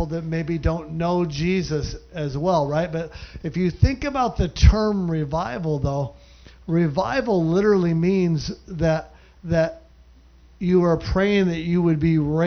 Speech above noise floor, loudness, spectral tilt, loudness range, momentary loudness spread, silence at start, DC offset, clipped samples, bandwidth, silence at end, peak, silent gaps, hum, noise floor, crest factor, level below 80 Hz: 29 dB; -22 LUFS; -7.5 dB/octave; 2 LU; 10 LU; 0 s; under 0.1%; under 0.1%; 6.6 kHz; 0 s; -2 dBFS; none; none; -50 dBFS; 20 dB; -30 dBFS